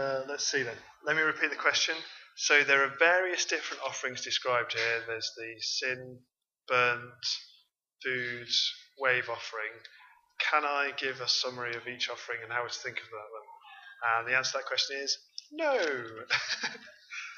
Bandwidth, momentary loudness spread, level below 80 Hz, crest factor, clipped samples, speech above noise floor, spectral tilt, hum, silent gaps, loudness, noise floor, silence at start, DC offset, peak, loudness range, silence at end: 7.6 kHz; 14 LU; -82 dBFS; 24 dB; under 0.1%; 35 dB; -1 dB/octave; none; none; -30 LUFS; -67 dBFS; 0 s; under 0.1%; -8 dBFS; 6 LU; 0 s